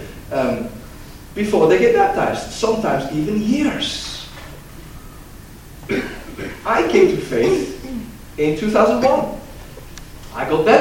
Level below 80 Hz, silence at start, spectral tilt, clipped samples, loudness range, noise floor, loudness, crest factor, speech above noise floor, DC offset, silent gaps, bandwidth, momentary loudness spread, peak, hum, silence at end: -40 dBFS; 0 s; -5 dB/octave; under 0.1%; 6 LU; -38 dBFS; -18 LUFS; 18 dB; 22 dB; under 0.1%; none; 17 kHz; 24 LU; 0 dBFS; none; 0 s